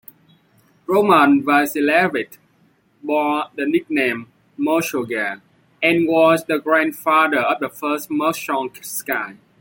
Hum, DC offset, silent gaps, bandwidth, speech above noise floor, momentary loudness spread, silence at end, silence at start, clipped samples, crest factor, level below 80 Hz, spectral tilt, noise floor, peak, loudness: none; under 0.1%; none; 17 kHz; 40 dB; 12 LU; 0.25 s; 0.9 s; under 0.1%; 16 dB; -66 dBFS; -4.5 dB/octave; -58 dBFS; -2 dBFS; -18 LUFS